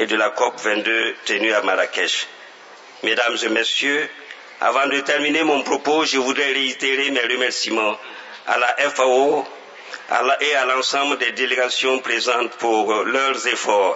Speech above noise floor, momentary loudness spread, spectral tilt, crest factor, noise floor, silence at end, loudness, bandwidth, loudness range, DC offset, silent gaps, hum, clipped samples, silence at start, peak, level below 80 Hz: 23 dB; 6 LU; -1 dB/octave; 18 dB; -42 dBFS; 0 s; -19 LUFS; 8 kHz; 2 LU; under 0.1%; none; none; under 0.1%; 0 s; -2 dBFS; -82 dBFS